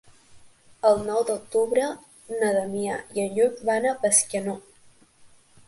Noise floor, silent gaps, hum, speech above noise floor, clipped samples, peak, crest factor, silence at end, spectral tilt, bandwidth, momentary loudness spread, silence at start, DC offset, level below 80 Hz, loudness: -55 dBFS; none; none; 31 dB; under 0.1%; -4 dBFS; 22 dB; 0.4 s; -3 dB/octave; 12 kHz; 11 LU; 0.35 s; under 0.1%; -62 dBFS; -24 LUFS